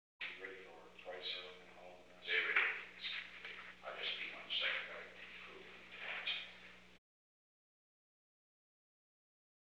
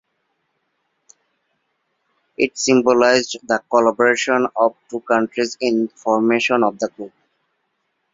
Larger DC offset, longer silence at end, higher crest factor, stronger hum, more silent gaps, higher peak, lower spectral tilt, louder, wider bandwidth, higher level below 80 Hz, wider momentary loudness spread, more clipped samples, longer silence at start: neither; first, 2.8 s vs 1.05 s; first, 24 dB vs 18 dB; first, 60 Hz at -80 dBFS vs none; neither; second, -22 dBFS vs -2 dBFS; second, -2 dB/octave vs -3.5 dB/octave; second, -42 LUFS vs -18 LUFS; first, 14 kHz vs 7.8 kHz; second, -80 dBFS vs -64 dBFS; first, 21 LU vs 12 LU; neither; second, 0.2 s vs 2.4 s